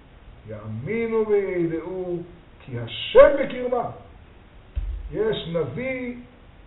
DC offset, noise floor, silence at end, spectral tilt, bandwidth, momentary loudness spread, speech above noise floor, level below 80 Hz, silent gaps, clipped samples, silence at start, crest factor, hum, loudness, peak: under 0.1%; -48 dBFS; 0.4 s; -4.5 dB/octave; 4.1 kHz; 21 LU; 25 dB; -40 dBFS; none; under 0.1%; 0.25 s; 24 dB; none; -23 LUFS; 0 dBFS